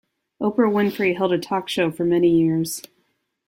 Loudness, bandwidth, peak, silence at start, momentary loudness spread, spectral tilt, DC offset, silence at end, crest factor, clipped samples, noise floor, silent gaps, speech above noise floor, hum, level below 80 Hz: -21 LUFS; 16.5 kHz; -6 dBFS; 0.4 s; 8 LU; -5.5 dB/octave; under 0.1%; 0.7 s; 14 dB; under 0.1%; -69 dBFS; none; 49 dB; none; -60 dBFS